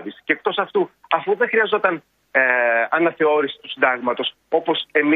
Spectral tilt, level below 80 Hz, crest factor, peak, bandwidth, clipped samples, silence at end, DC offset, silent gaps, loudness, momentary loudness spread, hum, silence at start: -7 dB/octave; -70 dBFS; 18 dB; -2 dBFS; 4.6 kHz; under 0.1%; 0 s; under 0.1%; none; -19 LUFS; 6 LU; none; 0 s